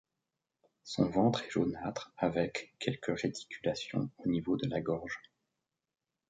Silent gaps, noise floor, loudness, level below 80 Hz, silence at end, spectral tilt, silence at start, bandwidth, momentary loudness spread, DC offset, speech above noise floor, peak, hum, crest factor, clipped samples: none; -90 dBFS; -35 LUFS; -64 dBFS; 1.1 s; -6 dB/octave; 0.85 s; 9.2 kHz; 9 LU; under 0.1%; 56 dB; -14 dBFS; none; 20 dB; under 0.1%